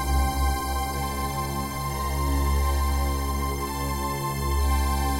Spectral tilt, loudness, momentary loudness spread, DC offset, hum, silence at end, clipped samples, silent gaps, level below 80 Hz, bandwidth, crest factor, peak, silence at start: -5 dB/octave; -27 LUFS; 4 LU; 0.3%; none; 0 s; under 0.1%; none; -26 dBFS; 16 kHz; 14 dB; -12 dBFS; 0 s